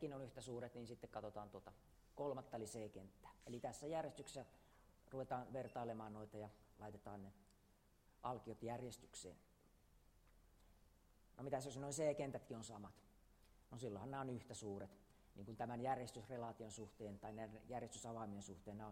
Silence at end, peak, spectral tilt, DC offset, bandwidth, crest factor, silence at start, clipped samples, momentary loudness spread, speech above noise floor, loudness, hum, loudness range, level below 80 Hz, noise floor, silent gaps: 0 s; -30 dBFS; -5.5 dB/octave; under 0.1%; 16 kHz; 22 dB; 0 s; under 0.1%; 13 LU; 24 dB; -51 LUFS; none; 6 LU; -74 dBFS; -75 dBFS; none